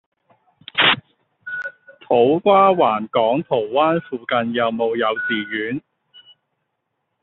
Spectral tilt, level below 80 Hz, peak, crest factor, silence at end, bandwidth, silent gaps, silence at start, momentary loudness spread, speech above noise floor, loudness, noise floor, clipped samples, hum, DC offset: -2 dB/octave; -64 dBFS; -2 dBFS; 18 dB; 1.45 s; 4.3 kHz; none; 0.75 s; 15 LU; 57 dB; -18 LUFS; -75 dBFS; under 0.1%; none; under 0.1%